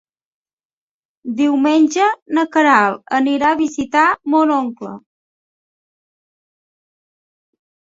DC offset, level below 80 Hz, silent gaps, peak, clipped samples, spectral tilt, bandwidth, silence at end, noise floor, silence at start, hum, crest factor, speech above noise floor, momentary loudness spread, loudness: under 0.1%; -62 dBFS; 2.22-2.26 s; 0 dBFS; under 0.1%; -4 dB/octave; 7.8 kHz; 2.85 s; under -90 dBFS; 1.25 s; none; 18 dB; over 75 dB; 13 LU; -15 LUFS